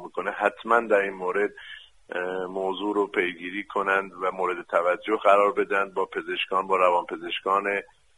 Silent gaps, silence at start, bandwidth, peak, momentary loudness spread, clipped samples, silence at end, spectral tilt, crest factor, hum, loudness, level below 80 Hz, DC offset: none; 0 s; 11 kHz; -6 dBFS; 10 LU; under 0.1%; 0.35 s; -4.5 dB/octave; 20 dB; none; -25 LUFS; -68 dBFS; under 0.1%